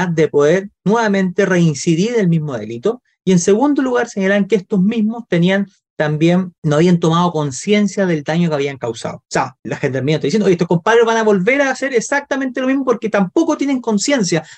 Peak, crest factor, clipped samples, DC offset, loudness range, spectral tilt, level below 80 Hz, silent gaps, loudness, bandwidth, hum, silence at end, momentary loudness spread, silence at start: -4 dBFS; 12 dB; under 0.1%; under 0.1%; 2 LU; -6 dB/octave; -58 dBFS; 5.90-5.96 s, 6.58-6.62 s, 9.59-9.63 s; -16 LUFS; 9 kHz; none; 0.05 s; 7 LU; 0 s